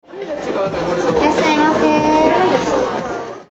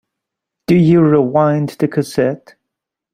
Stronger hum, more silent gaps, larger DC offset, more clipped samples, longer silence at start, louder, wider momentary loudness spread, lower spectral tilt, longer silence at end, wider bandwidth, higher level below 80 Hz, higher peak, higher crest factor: neither; neither; neither; neither; second, 0.1 s vs 0.7 s; about the same, -15 LUFS vs -14 LUFS; first, 12 LU vs 9 LU; second, -5 dB/octave vs -8 dB/octave; second, 0.05 s vs 0.8 s; second, 8.2 kHz vs 15 kHz; first, -42 dBFS vs -54 dBFS; about the same, 0 dBFS vs -2 dBFS; about the same, 16 dB vs 14 dB